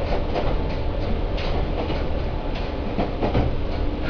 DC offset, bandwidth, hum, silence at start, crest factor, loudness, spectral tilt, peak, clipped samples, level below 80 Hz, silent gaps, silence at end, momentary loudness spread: under 0.1%; 5.4 kHz; none; 0 s; 14 dB; -26 LUFS; -8 dB/octave; -8 dBFS; under 0.1%; -26 dBFS; none; 0 s; 5 LU